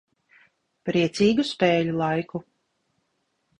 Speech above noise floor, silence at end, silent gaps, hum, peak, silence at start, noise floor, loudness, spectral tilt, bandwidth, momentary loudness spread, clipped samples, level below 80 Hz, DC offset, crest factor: 51 dB; 1.2 s; none; none; -6 dBFS; 0.85 s; -74 dBFS; -23 LUFS; -6 dB/octave; 11 kHz; 14 LU; under 0.1%; -60 dBFS; under 0.1%; 20 dB